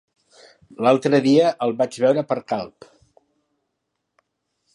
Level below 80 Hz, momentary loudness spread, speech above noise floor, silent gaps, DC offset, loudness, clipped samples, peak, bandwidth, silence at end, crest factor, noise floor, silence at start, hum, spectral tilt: -70 dBFS; 11 LU; 58 dB; none; under 0.1%; -19 LUFS; under 0.1%; -4 dBFS; 11.5 kHz; 2.1 s; 18 dB; -77 dBFS; 0.8 s; none; -6.5 dB/octave